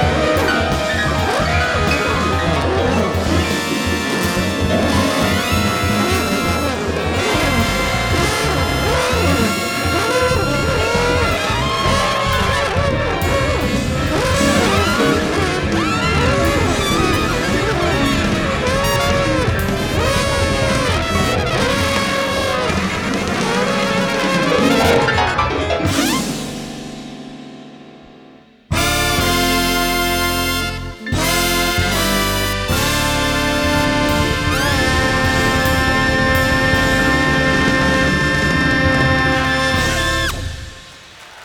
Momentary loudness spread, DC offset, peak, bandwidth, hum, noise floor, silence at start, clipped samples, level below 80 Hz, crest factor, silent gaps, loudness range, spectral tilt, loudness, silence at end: 4 LU; under 0.1%; 0 dBFS; over 20 kHz; none; -44 dBFS; 0 s; under 0.1%; -28 dBFS; 16 dB; none; 3 LU; -4.5 dB/octave; -16 LUFS; 0 s